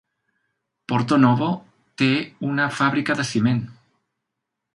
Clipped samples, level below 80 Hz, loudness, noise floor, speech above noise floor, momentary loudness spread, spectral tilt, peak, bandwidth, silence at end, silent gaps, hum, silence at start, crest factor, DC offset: under 0.1%; -62 dBFS; -21 LUFS; -81 dBFS; 61 dB; 9 LU; -6 dB/octave; -2 dBFS; 11.5 kHz; 1 s; none; none; 0.9 s; 20 dB; under 0.1%